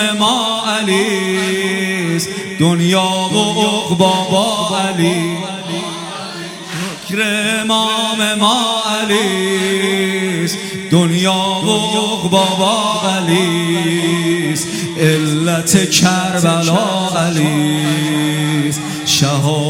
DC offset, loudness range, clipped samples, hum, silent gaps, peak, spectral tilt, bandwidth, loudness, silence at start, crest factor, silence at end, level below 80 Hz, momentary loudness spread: under 0.1%; 3 LU; under 0.1%; none; none; 0 dBFS; -4 dB/octave; 16.5 kHz; -14 LUFS; 0 s; 14 dB; 0 s; -54 dBFS; 7 LU